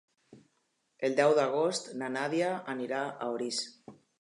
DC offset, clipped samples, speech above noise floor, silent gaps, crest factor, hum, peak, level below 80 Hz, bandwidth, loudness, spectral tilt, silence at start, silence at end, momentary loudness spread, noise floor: under 0.1%; under 0.1%; 46 dB; none; 20 dB; none; -12 dBFS; -86 dBFS; 11.5 kHz; -31 LUFS; -4 dB/octave; 0.3 s; 0.25 s; 10 LU; -77 dBFS